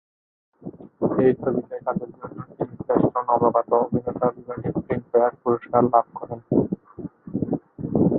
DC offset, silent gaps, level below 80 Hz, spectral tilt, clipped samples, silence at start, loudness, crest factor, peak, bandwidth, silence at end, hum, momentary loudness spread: under 0.1%; none; -52 dBFS; -13.5 dB/octave; under 0.1%; 0.6 s; -23 LUFS; 20 dB; -2 dBFS; 3.7 kHz; 0 s; none; 17 LU